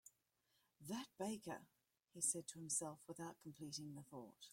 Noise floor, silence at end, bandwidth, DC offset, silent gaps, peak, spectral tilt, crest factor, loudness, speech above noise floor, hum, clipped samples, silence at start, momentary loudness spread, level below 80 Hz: -84 dBFS; 0 s; 16.5 kHz; under 0.1%; none; -26 dBFS; -3 dB/octave; 24 dB; -48 LUFS; 35 dB; none; under 0.1%; 0.05 s; 16 LU; -88 dBFS